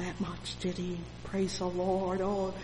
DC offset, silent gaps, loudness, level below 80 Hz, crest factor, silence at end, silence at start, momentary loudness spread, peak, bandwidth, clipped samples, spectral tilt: under 0.1%; none; -34 LUFS; -50 dBFS; 16 dB; 0 s; 0 s; 7 LU; -18 dBFS; 11 kHz; under 0.1%; -5.5 dB/octave